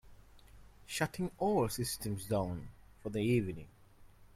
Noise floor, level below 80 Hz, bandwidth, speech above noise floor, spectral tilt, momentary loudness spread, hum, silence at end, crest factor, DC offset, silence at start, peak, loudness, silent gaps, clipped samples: -59 dBFS; -58 dBFS; 16.5 kHz; 24 dB; -5.5 dB/octave; 14 LU; none; 0.1 s; 20 dB; under 0.1%; 0.05 s; -16 dBFS; -36 LUFS; none; under 0.1%